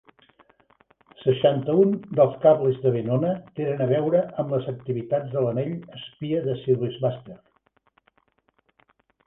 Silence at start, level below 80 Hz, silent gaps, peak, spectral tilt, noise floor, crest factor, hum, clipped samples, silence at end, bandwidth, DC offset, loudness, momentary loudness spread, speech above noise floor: 1.2 s; -64 dBFS; none; -4 dBFS; -11 dB/octave; -68 dBFS; 20 dB; none; under 0.1%; 1.9 s; 3.9 kHz; under 0.1%; -23 LUFS; 10 LU; 45 dB